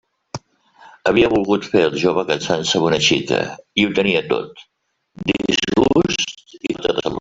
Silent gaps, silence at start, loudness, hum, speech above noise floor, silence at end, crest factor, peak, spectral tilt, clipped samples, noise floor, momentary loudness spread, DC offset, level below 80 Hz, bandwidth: none; 0.35 s; -18 LUFS; none; 31 dB; 0 s; 16 dB; -2 dBFS; -4 dB/octave; under 0.1%; -49 dBFS; 11 LU; under 0.1%; -48 dBFS; 8 kHz